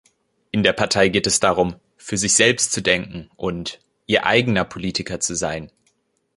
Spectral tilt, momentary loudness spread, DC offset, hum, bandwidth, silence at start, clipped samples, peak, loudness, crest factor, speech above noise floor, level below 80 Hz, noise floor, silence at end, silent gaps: -3 dB/octave; 14 LU; under 0.1%; none; 11.5 kHz; 0.55 s; under 0.1%; 0 dBFS; -19 LUFS; 20 dB; 47 dB; -48 dBFS; -66 dBFS; 0.7 s; none